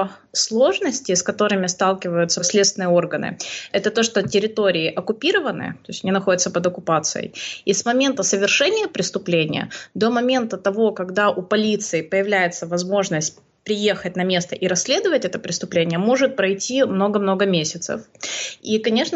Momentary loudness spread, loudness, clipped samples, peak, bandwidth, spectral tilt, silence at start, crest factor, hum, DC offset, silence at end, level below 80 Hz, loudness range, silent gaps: 8 LU; -20 LUFS; under 0.1%; -6 dBFS; 8.4 kHz; -3.5 dB/octave; 0 s; 14 dB; none; under 0.1%; 0 s; -66 dBFS; 2 LU; none